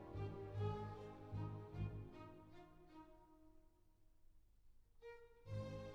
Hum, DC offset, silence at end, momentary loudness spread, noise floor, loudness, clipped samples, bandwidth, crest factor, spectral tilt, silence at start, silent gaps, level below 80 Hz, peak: none; under 0.1%; 0 s; 17 LU; -71 dBFS; -51 LUFS; under 0.1%; 7.6 kHz; 18 dB; -8.5 dB/octave; 0 s; none; -64 dBFS; -34 dBFS